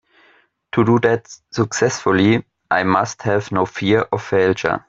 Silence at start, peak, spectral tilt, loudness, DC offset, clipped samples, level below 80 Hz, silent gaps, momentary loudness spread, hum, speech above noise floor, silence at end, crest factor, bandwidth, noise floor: 0.75 s; 0 dBFS; -5.5 dB/octave; -18 LUFS; under 0.1%; under 0.1%; -54 dBFS; none; 6 LU; none; 38 dB; 0.1 s; 18 dB; 7.8 kHz; -56 dBFS